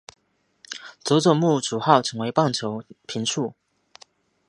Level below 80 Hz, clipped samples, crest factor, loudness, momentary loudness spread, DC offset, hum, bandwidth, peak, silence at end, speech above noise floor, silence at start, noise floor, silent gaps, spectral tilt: -70 dBFS; under 0.1%; 24 dB; -22 LUFS; 16 LU; under 0.1%; none; 11.5 kHz; 0 dBFS; 0.95 s; 35 dB; 0.7 s; -57 dBFS; none; -5 dB/octave